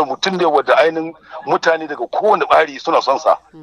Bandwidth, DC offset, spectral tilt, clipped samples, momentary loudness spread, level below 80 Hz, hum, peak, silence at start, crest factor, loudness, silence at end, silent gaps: 11 kHz; under 0.1%; -4 dB/octave; under 0.1%; 9 LU; -62 dBFS; none; 0 dBFS; 0 s; 16 dB; -15 LUFS; 0 s; none